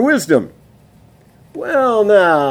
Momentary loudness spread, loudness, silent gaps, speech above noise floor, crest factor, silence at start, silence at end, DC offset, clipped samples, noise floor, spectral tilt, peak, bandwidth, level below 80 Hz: 20 LU; -13 LUFS; none; 34 dB; 16 dB; 0 s; 0 s; under 0.1%; under 0.1%; -47 dBFS; -5 dB/octave; 0 dBFS; 17.5 kHz; -56 dBFS